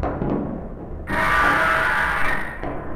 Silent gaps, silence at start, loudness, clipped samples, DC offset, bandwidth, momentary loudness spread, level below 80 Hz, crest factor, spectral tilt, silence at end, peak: none; 0 s; -20 LUFS; under 0.1%; under 0.1%; over 20 kHz; 15 LU; -34 dBFS; 16 dB; -5 dB/octave; 0 s; -6 dBFS